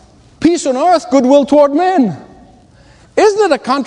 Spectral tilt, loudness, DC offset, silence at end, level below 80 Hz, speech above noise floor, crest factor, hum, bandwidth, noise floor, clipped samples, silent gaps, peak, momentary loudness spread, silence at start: -5 dB/octave; -11 LUFS; under 0.1%; 0 s; -50 dBFS; 33 dB; 12 dB; none; 10.5 kHz; -44 dBFS; 0.2%; none; 0 dBFS; 7 LU; 0.4 s